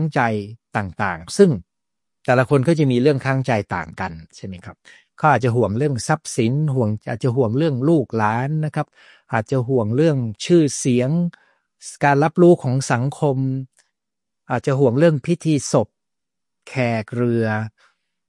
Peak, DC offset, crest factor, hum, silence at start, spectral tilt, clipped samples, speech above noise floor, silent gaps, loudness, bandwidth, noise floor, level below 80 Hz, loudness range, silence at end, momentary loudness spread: -2 dBFS; under 0.1%; 18 dB; none; 0 s; -6.5 dB/octave; under 0.1%; 67 dB; none; -19 LUFS; 11.5 kHz; -85 dBFS; -60 dBFS; 3 LU; 0.6 s; 13 LU